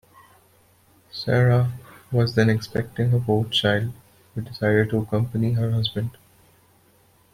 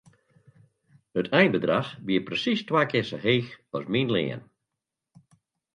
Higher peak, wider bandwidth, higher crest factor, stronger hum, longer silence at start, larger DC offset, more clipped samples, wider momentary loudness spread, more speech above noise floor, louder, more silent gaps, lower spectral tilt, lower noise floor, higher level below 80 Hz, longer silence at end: about the same, -4 dBFS vs -6 dBFS; first, 15 kHz vs 10.5 kHz; about the same, 20 dB vs 22 dB; neither; about the same, 1.15 s vs 1.15 s; neither; neither; about the same, 13 LU vs 12 LU; second, 37 dB vs 61 dB; first, -23 LUFS vs -26 LUFS; neither; about the same, -7 dB/octave vs -6.5 dB/octave; second, -58 dBFS vs -86 dBFS; first, -54 dBFS vs -66 dBFS; second, 1.2 s vs 1.35 s